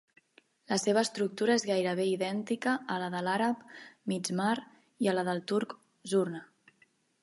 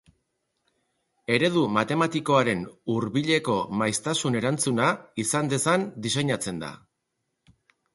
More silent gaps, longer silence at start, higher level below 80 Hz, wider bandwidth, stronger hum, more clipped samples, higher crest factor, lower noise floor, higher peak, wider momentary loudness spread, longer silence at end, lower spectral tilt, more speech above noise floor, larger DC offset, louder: neither; second, 0.7 s vs 1.3 s; second, -82 dBFS vs -62 dBFS; about the same, 11.5 kHz vs 12 kHz; neither; neither; about the same, 18 dB vs 20 dB; second, -69 dBFS vs -79 dBFS; second, -14 dBFS vs -8 dBFS; about the same, 9 LU vs 7 LU; second, 0.75 s vs 1.2 s; about the same, -4.5 dB/octave vs -4.5 dB/octave; second, 38 dB vs 54 dB; neither; second, -31 LUFS vs -25 LUFS